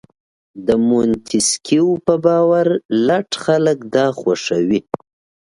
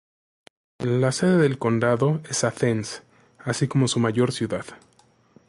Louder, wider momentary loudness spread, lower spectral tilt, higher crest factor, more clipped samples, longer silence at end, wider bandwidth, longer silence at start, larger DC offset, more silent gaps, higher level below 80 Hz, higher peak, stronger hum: first, -16 LUFS vs -23 LUFS; second, 5 LU vs 12 LU; about the same, -4.5 dB/octave vs -5.5 dB/octave; about the same, 16 dB vs 16 dB; neither; second, 0.45 s vs 0.75 s; about the same, 11.5 kHz vs 11.5 kHz; second, 0.55 s vs 0.8 s; neither; first, 2.85-2.89 s vs none; first, -54 dBFS vs -60 dBFS; first, 0 dBFS vs -8 dBFS; neither